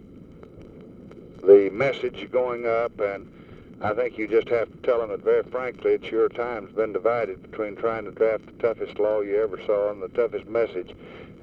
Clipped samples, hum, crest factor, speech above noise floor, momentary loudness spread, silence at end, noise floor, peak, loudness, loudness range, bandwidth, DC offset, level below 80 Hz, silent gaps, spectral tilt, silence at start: under 0.1%; none; 22 dB; 21 dB; 12 LU; 0.1 s; -45 dBFS; -4 dBFS; -24 LUFS; 3 LU; 6 kHz; under 0.1%; -56 dBFS; none; -7.5 dB/octave; 0.05 s